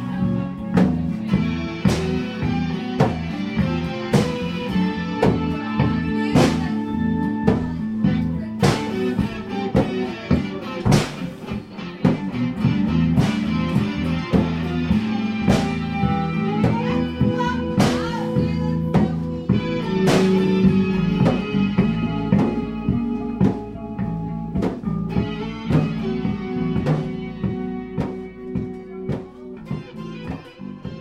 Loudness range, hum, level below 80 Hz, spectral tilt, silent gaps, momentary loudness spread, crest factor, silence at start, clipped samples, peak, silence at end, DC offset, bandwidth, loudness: 5 LU; none; -38 dBFS; -7 dB/octave; none; 10 LU; 20 dB; 0 s; under 0.1%; -2 dBFS; 0 s; under 0.1%; 13 kHz; -22 LUFS